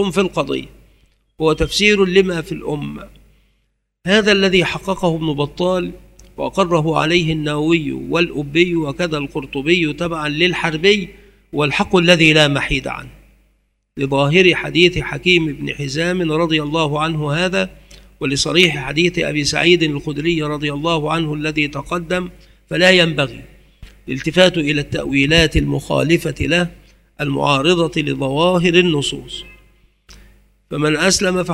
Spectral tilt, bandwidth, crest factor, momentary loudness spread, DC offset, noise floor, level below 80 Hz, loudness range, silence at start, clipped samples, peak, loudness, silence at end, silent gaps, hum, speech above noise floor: -4.5 dB/octave; 15.5 kHz; 18 dB; 12 LU; under 0.1%; -66 dBFS; -38 dBFS; 3 LU; 0 s; under 0.1%; 0 dBFS; -16 LUFS; 0 s; none; 50 Hz at -45 dBFS; 50 dB